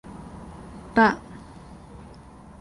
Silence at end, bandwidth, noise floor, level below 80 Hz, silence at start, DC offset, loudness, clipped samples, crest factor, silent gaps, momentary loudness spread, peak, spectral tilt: 1.25 s; 11.5 kHz; -46 dBFS; -50 dBFS; 0.2 s; under 0.1%; -22 LUFS; under 0.1%; 22 dB; none; 26 LU; -6 dBFS; -6.5 dB/octave